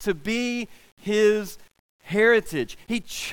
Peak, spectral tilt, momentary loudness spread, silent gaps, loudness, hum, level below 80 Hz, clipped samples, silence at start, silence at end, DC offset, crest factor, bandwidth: -8 dBFS; -4 dB/octave; 15 LU; 0.92-0.97 s, 1.79-1.99 s; -24 LUFS; none; -54 dBFS; under 0.1%; 0 s; 0 s; under 0.1%; 16 dB; 17.5 kHz